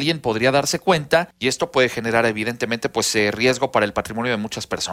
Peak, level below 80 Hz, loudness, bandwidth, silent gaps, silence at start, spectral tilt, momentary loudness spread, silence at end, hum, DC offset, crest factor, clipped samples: -4 dBFS; -52 dBFS; -20 LUFS; 16 kHz; none; 0 s; -3.5 dB/octave; 6 LU; 0 s; none; under 0.1%; 16 dB; under 0.1%